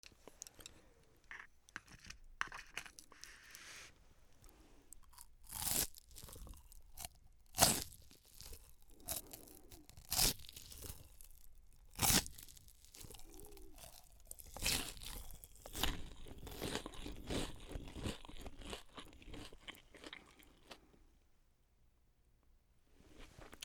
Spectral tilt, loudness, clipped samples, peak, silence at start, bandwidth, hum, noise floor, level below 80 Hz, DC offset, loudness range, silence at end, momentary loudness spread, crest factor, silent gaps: -2 dB/octave; -40 LUFS; under 0.1%; -10 dBFS; 0.05 s; over 20 kHz; none; -72 dBFS; -56 dBFS; under 0.1%; 16 LU; 0 s; 25 LU; 36 dB; none